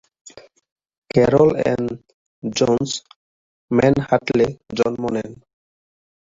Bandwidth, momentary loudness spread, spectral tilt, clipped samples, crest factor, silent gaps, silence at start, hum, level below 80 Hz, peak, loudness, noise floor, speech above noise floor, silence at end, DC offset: 7.8 kHz; 13 LU; -6 dB/octave; under 0.1%; 18 dB; 0.72-0.76 s, 0.98-1.02 s, 2.14-2.42 s, 3.16-3.68 s; 0.25 s; none; -48 dBFS; -2 dBFS; -19 LUFS; under -90 dBFS; over 72 dB; 0.85 s; under 0.1%